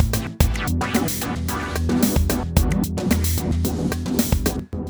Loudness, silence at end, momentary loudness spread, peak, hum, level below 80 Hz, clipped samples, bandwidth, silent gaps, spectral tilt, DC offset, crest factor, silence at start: -22 LUFS; 0 s; 5 LU; 0 dBFS; none; -26 dBFS; under 0.1%; over 20 kHz; none; -5 dB/octave; under 0.1%; 20 dB; 0 s